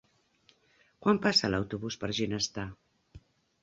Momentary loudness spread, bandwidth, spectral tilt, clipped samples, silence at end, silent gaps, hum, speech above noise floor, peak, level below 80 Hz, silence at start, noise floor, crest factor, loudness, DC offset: 12 LU; 8 kHz; -4 dB/octave; under 0.1%; 0.45 s; none; none; 37 dB; -12 dBFS; -58 dBFS; 1 s; -67 dBFS; 20 dB; -30 LUFS; under 0.1%